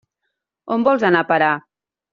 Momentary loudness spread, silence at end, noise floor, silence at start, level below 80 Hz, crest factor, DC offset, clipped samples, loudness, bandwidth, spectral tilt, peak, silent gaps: 9 LU; 0.55 s; -77 dBFS; 0.65 s; -64 dBFS; 16 dB; under 0.1%; under 0.1%; -17 LUFS; 7.2 kHz; -3.5 dB/octave; -2 dBFS; none